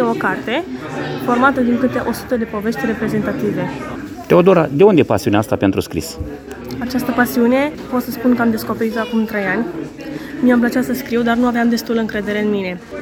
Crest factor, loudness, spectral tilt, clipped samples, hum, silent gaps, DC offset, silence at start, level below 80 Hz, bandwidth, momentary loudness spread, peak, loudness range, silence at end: 16 dB; -17 LUFS; -6 dB/octave; under 0.1%; none; none; under 0.1%; 0 s; -44 dBFS; 20 kHz; 13 LU; 0 dBFS; 3 LU; 0 s